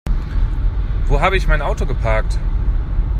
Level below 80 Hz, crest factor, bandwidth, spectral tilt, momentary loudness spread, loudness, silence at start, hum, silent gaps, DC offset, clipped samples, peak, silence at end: -18 dBFS; 14 dB; 9.2 kHz; -6.5 dB/octave; 6 LU; -20 LUFS; 0.05 s; none; none; under 0.1%; under 0.1%; -2 dBFS; 0 s